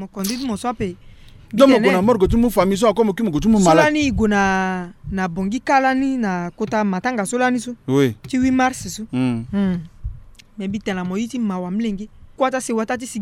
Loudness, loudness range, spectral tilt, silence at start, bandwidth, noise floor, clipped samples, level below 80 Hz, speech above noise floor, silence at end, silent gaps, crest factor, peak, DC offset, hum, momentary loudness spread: -19 LUFS; 8 LU; -5.5 dB/octave; 0 s; 16 kHz; -38 dBFS; under 0.1%; -38 dBFS; 20 dB; 0 s; none; 18 dB; -2 dBFS; under 0.1%; none; 13 LU